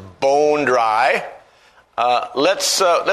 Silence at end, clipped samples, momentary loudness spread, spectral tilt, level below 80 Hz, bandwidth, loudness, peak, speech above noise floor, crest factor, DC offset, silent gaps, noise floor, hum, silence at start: 0 s; under 0.1%; 7 LU; -2 dB/octave; -62 dBFS; 13.5 kHz; -17 LUFS; -2 dBFS; 35 dB; 16 dB; under 0.1%; none; -52 dBFS; none; 0 s